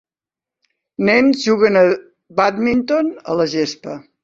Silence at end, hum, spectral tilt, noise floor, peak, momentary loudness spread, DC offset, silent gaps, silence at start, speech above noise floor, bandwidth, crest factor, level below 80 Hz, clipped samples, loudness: 0.25 s; none; -5.5 dB/octave; -89 dBFS; -2 dBFS; 12 LU; under 0.1%; none; 1 s; 74 dB; 7.6 kHz; 16 dB; -56 dBFS; under 0.1%; -16 LUFS